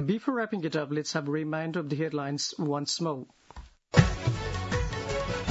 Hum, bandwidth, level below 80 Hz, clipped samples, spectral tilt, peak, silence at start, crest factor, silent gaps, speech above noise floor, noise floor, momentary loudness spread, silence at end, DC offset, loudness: none; 8 kHz; -42 dBFS; under 0.1%; -5.5 dB/octave; -6 dBFS; 0 s; 24 dB; none; 18 dB; -49 dBFS; 7 LU; 0 s; under 0.1%; -30 LUFS